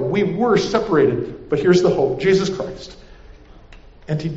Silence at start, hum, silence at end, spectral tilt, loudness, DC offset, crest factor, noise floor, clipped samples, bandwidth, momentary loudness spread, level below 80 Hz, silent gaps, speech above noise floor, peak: 0 s; none; 0 s; -5.5 dB/octave; -18 LUFS; under 0.1%; 16 dB; -43 dBFS; under 0.1%; 8 kHz; 13 LU; -44 dBFS; none; 25 dB; -2 dBFS